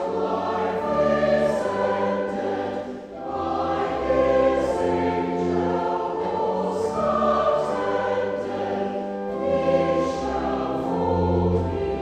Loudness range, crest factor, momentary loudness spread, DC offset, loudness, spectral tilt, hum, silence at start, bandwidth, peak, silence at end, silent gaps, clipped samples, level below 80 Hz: 1 LU; 14 dB; 7 LU; under 0.1%; -23 LUFS; -7 dB/octave; none; 0 s; 9.8 kHz; -8 dBFS; 0 s; none; under 0.1%; -46 dBFS